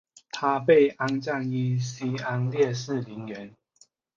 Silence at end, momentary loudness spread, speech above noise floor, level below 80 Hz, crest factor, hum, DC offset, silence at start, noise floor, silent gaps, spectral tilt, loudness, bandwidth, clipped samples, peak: 0.7 s; 18 LU; 37 dB; -70 dBFS; 18 dB; none; under 0.1%; 0.35 s; -62 dBFS; none; -6.5 dB/octave; -25 LUFS; 7.6 kHz; under 0.1%; -8 dBFS